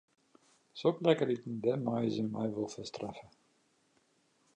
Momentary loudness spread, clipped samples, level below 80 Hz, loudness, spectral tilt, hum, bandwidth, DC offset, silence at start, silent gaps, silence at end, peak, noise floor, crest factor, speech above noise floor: 14 LU; under 0.1%; -74 dBFS; -34 LUFS; -6.5 dB/octave; none; 9.8 kHz; under 0.1%; 0.75 s; none; 1.3 s; -12 dBFS; -73 dBFS; 24 dB; 39 dB